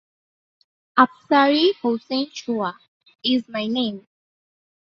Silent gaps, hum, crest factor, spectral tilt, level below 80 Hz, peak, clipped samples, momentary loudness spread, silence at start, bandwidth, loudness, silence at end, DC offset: 2.88-3.00 s; none; 20 dB; -4.5 dB/octave; -70 dBFS; -2 dBFS; under 0.1%; 10 LU; 0.95 s; 7 kHz; -21 LUFS; 0.85 s; under 0.1%